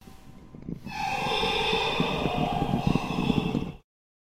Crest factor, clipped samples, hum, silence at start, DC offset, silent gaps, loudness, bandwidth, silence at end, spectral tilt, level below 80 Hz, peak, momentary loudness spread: 20 dB; under 0.1%; none; 0.05 s; under 0.1%; none; -27 LUFS; 16 kHz; 0.45 s; -5.5 dB/octave; -44 dBFS; -10 dBFS; 14 LU